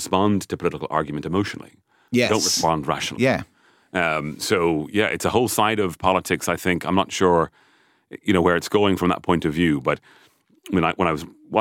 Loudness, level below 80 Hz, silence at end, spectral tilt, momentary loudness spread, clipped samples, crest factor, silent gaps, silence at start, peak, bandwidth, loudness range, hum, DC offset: -21 LUFS; -50 dBFS; 0 s; -4.5 dB/octave; 7 LU; under 0.1%; 18 dB; none; 0 s; -4 dBFS; 17 kHz; 2 LU; none; under 0.1%